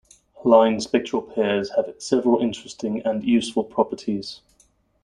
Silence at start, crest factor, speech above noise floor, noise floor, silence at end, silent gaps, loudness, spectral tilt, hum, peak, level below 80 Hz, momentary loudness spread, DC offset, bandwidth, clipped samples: 0.4 s; 22 dB; 40 dB; -61 dBFS; 0.7 s; none; -22 LUFS; -5 dB/octave; none; 0 dBFS; -60 dBFS; 12 LU; under 0.1%; 11 kHz; under 0.1%